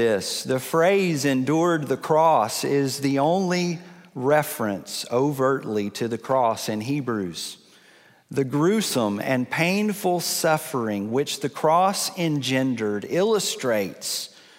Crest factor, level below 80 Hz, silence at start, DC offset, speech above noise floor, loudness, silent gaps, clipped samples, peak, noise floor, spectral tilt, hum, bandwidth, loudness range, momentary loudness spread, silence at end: 16 dB; -70 dBFS; 0 s; under 0.1%; 32 dB; -23 LUFS; none; under 0.1%; -6 dBFS; -54 dBFS; -4.5 dB/octave; none; 16 kHz; 4 LU; 8 LU; 0.3 s